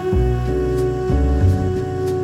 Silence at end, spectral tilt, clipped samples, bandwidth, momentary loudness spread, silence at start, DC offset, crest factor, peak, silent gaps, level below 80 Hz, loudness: 0 s; -8.5 dB/octave; under 0.1%; 12.5 kHz; 5 LU; 0 s; under 0.1%; 12 dB; -4 dBFS; none; -22 dBFS; -19 LUFS